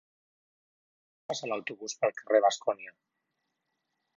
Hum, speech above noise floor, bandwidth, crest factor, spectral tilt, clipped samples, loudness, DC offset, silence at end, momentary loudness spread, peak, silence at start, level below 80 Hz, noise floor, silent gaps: none; 52 dB; 7.8 kHz; 22 dB; -2.5 dB/octave; under 0.1%; -30 LUFS; under 0.1%; 1.25 s; 15 LU; -12 dBFS; 1.3 s; -88 dBFS; -82 dBFS; none